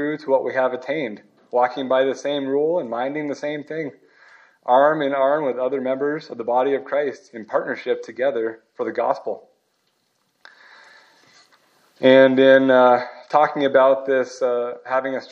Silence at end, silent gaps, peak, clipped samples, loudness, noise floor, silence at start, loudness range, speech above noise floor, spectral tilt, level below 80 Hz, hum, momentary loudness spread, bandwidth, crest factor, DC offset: 0.05 s; none; -2 dBFS; under 0.1%; -20 LUFS; -68 dBFS; 0 s; 11 LU; 49 dB; -5.5 dB/octave; -80 dBFS; none; 14 LU; 7.2 kHz; 20 dB; under 0.1%